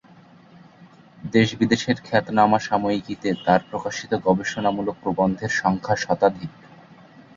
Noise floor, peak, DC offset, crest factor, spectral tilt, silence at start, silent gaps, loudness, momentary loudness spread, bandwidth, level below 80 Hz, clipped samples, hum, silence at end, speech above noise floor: -50 dBFS; -2 dBFS; under 0.1%; 20 dB; -5.5 dB/octave; 0.8 s; none; -22 LUFS; 8 LU; 7.6 kHz; -54 dBFS; under 0.1%; none; 0.85 s; 28 dB